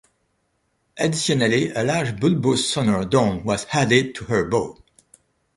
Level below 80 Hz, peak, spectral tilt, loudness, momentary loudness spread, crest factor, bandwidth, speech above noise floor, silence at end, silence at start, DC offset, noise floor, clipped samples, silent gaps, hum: -50 dBFS; -4 dBFS; -5 dB/octave; -20 LUFS; 5 LU; 18 dB; 11.5 kHz; 49 dB; 0.85 s; 0.95 s; under 0.1%; -69 dBFS; under 0.1%; none; none